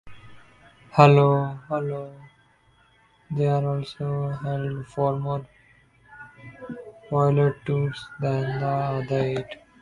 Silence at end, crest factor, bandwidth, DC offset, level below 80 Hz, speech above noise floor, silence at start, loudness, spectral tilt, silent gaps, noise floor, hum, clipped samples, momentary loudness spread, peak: 0.25 s; 24 dB; 7.4 kHz; under 0.1%; -58 dBFS; 37 dB; 0.05 s; -24 LUFS; -8.5 dB/octave; none; -60 dBFS; none; under 0.1%; 21 LU; 0 dBFS